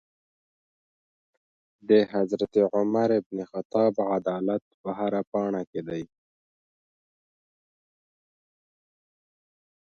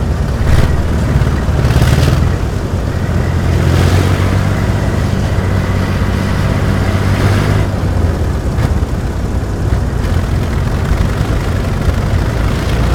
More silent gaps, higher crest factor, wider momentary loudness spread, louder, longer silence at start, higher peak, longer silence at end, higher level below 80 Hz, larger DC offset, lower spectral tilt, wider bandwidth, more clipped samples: first, 3.26-3.30 s, 3.65-3.70 s, 4.62-4.84 s, 5.27-5.32 s, 5.67-5.73 s vs none; first, 22 dB vs 12 dB; first, 13 LU vs 5 LU; second, -26 LUFS vs -14 LUFS; first, 1.9 s vs 0 s; second, -8 dBFS vs 0 dBFS; first, 3.85 s vs 0 s; second, -72 dBFS vs -18 dBFS; neither; first, -8 dB/octave vs -6.5 dB/octave; second, 7 kHz vs 16.5 kHz; second, under 0.1% vs 0.2%